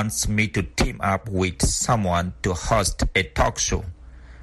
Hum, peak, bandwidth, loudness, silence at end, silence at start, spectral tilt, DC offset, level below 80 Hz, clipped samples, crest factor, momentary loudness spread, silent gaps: none; -6 dBFS; 12.5 kHz; -23 LUFS; 0 s; 0 s; -4 dB/octave; under 0.1%; -32 dBFS; under 0.1%; 18 dB; 5 LU; none